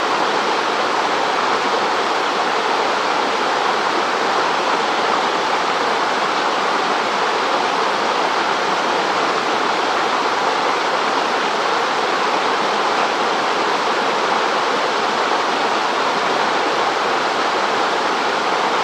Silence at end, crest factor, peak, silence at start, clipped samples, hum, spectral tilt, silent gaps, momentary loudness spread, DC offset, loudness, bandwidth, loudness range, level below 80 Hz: 0 s; 14 dB; -4 dBFS; 0 s; under 0.1%; none; -2 dB/octave; none; 1 LU; under 0.1%; -17 LUFS; 15.5 kHz; 0 LU; -70 dBFS